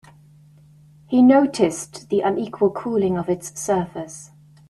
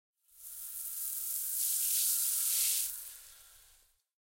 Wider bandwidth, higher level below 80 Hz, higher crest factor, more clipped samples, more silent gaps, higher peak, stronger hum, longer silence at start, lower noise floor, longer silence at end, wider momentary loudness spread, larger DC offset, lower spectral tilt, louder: second, 12.5 kHz vs 16.5 kHz; first, -58 dBFS vs -72 dBFS; about the same, 16 dB vs 20 dB; neither; neither; first, -4 dBFS vs -16 dBFS; neither; first, 1.1 s vs 0.35 s; second, -50 dBFS vs -67 dBFS; second, 0.45 s vs 0.8 s; about the same, 17 LU vs 19 LU; neither; first, -6 dB/octave vs 5 dB/octave; first, -20 LUFS vs -31 LUFS